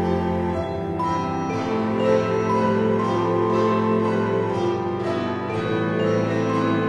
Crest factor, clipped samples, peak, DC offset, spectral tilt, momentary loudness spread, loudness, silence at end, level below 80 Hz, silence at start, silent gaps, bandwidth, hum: 16 dB; under 0.1%; -6 dBFS; under 0.1%; -7.5 dB/octave; 5 LU; -22 LUFS; 0 s; -50 dBFS; 0 s; none; 9.6 kHz; none